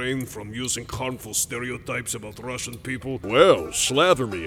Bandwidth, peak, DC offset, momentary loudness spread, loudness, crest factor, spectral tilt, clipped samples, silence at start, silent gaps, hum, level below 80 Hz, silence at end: 18.5 kHz; -4 dBFS; under 0.1%; 13 LU; -23 LUFS; 20 dB; -3 dB/octave; under 0.1%; 0 s; none; none; -50 dBFS; 0 s